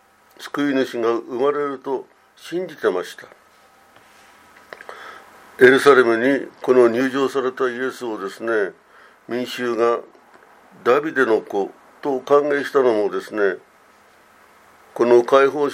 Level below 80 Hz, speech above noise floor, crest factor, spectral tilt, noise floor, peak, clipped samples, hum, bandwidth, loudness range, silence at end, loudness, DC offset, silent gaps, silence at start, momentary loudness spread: -72 dBFS; 34 dB; 20 dB; -5 dB/octave; -52 dBFS; 0 dBFS; under 0.1%; none; 15.5 kHz; 9 LU; 0 s; -19 LUFS; under 0.1%; none; 0.4 s; 16 LU